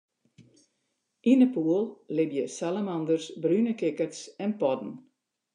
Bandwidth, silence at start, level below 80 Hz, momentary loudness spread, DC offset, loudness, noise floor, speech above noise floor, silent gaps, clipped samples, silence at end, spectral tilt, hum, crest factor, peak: 10 kHz; 1.25 s; -88 dBFS; 12 LU; under 0.1%; -28 LUFS; -79 dBFS; 52 dB; none; under 0.1%; 0.55 s; -6.5 dB/octave; none; 18 dB; -10 dBFS